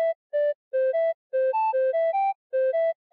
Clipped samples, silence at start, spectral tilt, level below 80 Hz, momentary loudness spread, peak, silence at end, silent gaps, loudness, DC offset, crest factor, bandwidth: under 0.1%; 0 s; 4.5 dB/octave; under -90 dBFS; 3 LU; -18 dBFS; 0.2 s; 0.15-0.30 s, 0.55-0.71 s, 1.14-1.30 s, 2.35-2.50 s; -25 LUFS; under 0.1%; 6 dB; 4.7 kHz